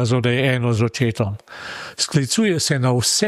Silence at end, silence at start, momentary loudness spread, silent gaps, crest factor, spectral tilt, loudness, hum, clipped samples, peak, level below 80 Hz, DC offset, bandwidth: 0 s; 0 s; 13 LU; none; 14 dB; -4.5 dB/octave; -19 LUFS; none; under 0.1%; -4 dBFS; -54 dBFS; under 0.1%; 13.5 kHz